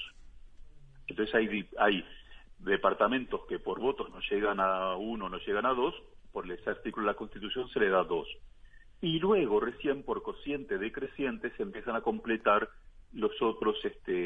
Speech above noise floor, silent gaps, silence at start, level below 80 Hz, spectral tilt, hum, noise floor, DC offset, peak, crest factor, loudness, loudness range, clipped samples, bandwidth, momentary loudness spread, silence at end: 22 dB; none; 0 s; -54 dBFS; -7.5 dB/octave; none; -54 dBFS; under 0.1%; -10 dBFS; 22 dB; -32 LUFS; 2 LU; under 0.1%; 4.7 kHz; 12 LU; 0 s